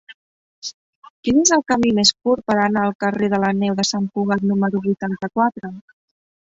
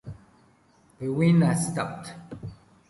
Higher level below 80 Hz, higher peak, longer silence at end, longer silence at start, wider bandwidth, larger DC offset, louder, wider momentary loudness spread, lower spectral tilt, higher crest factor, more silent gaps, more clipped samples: about the same, -54 dBFS vs -58 dBFS; first, -2 dBFS vs -10 dBFS; first, 0.65 s vs 0.35 s; about the same, 0.1 s vs 0.05 s; second, 7.8 kHz vs 11.5 kHz; neither; first, -18 LUFS vs -24 LUFS; second, 17 LU vs 21 LU; second, -4 dB/octave vs -6.5 dB/octave; about the same, 18 dB vs 18 dB; first, 0.14-0.62 s, 0.74-1.02 s, 1.10-1.23 s, 2.95-2.99 s vs none; neither